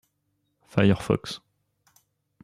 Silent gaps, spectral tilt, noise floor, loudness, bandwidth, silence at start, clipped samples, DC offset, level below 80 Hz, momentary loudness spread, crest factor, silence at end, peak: none; -7 dB/octave; -75 dBFS; -24 LUFS; 13 kHz; 0.75 s; under 0.1%; under 0.1%; -56 dBFS; 16 LU; 22 dB; 1.05 s; -6 dBFS